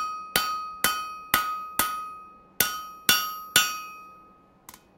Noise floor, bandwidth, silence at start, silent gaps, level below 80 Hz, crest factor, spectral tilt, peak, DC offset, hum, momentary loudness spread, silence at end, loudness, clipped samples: -55 dBFS; 16.5 kHz; 0 s; none; -58 dBFS; 28 dB; 0 dB/octave; -2 dBFS; under 0.1%; none; 15 LU; 0.2 s; -25 LUFS; under 0.1%